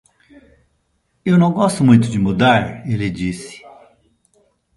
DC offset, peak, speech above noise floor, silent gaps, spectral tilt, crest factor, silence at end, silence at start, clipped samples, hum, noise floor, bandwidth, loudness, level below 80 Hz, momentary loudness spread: under 0.1%; 0 dBFS; 50 dB; none; -6.5 dB/octave; 18 dB; 1.2 s; 1.25 s; under 0.1%; none; -65 dBFS; 11.5 kHz; -16 LUFS; -46 dBFS; 13 LU